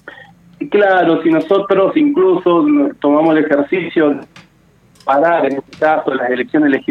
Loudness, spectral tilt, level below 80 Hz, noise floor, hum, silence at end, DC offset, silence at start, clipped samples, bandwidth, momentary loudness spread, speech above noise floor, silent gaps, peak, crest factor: -13 LUFS; -7.5 dB/octave; -60 dBFS; -50 dBFS; none; 0.1 s; under 0.1%; 0.05 s; under 0.1%; 5.8 kHz; 5 LU; 37 dB; none; 0 dBFS; 14 dB